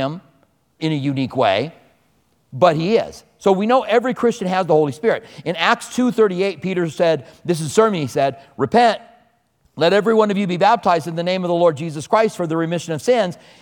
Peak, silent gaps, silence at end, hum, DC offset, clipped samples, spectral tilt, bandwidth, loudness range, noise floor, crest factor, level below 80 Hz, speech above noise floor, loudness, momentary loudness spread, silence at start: 0 dBFS; none; 0.25 s; none; under 0.1%; under 0.1%; -5.5 dB/octave; 18 kHz; 2 LU; -61 dBFS; 18 dB; -60 dBFS; 44 dB; -18 LUFS; 9 LU; 0 s